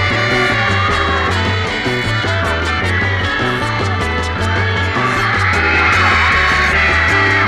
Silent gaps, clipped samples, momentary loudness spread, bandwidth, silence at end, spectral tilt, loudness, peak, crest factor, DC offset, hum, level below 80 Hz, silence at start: none; under 0.1%; 6 LU; 12.5 kHz; 0 s; -4.5 dB/octave; -13 LUFS; -2 dBFS; 14 dB; under 0.1%; none; -28 dBFS; 0 s